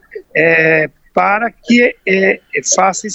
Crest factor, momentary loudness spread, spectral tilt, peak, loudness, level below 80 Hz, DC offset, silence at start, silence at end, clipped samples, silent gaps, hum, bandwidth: 14 dB; 7 LU; -3.5 dB/octave; 0 dBFS; -12 LUFS; -54 dBFS; under 0.1%; 0.15 s; 0 s; under 0.1%; none; none; 8.4 kHz